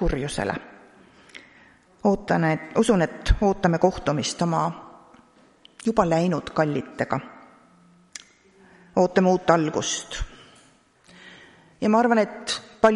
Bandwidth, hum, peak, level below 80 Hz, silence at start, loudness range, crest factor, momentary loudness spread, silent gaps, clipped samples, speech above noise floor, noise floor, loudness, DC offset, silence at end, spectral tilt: 11.5 kHz; none; -2 dBFS; -38 dBFS; 0 s; 4 LU; 22 dB; 16 LU; none; under 0.1%; 35 dB; -57 dBFS; -23 LUFS; under 0.1%; 0 s; -5.5 dB/octave